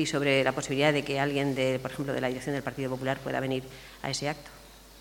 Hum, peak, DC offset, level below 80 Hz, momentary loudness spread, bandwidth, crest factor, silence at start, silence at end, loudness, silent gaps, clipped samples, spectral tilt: none; -8 dBFS; under 0.1%; -56 dBFS; 10 LU; 18 kHz; 22 dB; 0 s; 0 s; -29 LUFS; none; under 0.1%; -5 dB/octave